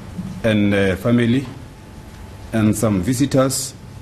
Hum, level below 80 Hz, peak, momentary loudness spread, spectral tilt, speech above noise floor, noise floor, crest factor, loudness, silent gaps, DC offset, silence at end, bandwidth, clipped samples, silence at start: none; -42 dBFS; -4 dBFS; 21 LU; -5.5 dB/octave; 21 dB; -37 dBFS; 16 dB; -18 LUFS; none; under 0.1%; 0 s; 13 kHz; under 0.1%; 0 s